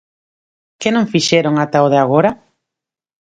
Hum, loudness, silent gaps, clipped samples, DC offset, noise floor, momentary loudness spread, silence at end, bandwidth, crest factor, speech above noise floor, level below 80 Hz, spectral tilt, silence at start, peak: none; -14 LUFS; none; under 0.1%; under 0.1%; -85 dBFS; 7 LU; 0.9 s; 9.4 kHz; 16 dB; 72 dB; -56 dBFS; -5 dB/octave; 0.8 s; 0 dBFS